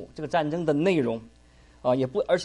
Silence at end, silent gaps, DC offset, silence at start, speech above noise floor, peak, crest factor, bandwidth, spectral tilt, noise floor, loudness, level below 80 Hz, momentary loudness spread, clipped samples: 0 s; none; under 0.1%; 0 s; 27 dB; -10 dBFS; 16 dB; 11.5 kHz; -6.5 dB/octave; -52 dBFS; -26 LUFS; -56 dBFS; 7 LU; under 0.1%